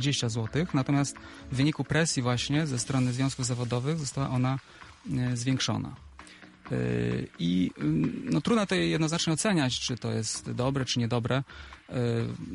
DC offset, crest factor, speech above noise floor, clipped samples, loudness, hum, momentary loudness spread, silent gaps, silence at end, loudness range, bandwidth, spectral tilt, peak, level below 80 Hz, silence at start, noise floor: under 0.1%; 16 dB; 22 dB; under 0.1%; -29 LUFS; none; 9 LU; none; 0 s; 4 LU; 11.5 kHz; -5 dB/octave; -12 dBFS; -54 dBFS; 0 s; -50 dBFS